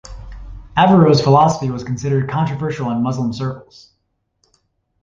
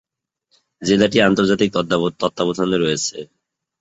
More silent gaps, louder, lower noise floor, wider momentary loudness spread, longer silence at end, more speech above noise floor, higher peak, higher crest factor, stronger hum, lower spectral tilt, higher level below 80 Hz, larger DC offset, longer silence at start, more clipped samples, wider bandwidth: neither; about the same, -16 LUFS vs -18 LUFS; about the same, -66 dBFS vs -69 dBFS; first, 24 LU vs 9 LU; first, 1.4 s vs 0.55 s; about the same, 51 dB vs 52 dB; about the same, -2 dBFS vs -2 dBFS; about the same, 16 dB vs 18 dB; neither; first, -7 dB/octave vs -4.5 dB/octave; first, -40 dBFS vs -52 dBFS; neither; second, 0.05 s vs 0.8 s; neither; about the same, 7.6 kHz vs 8.2 kHz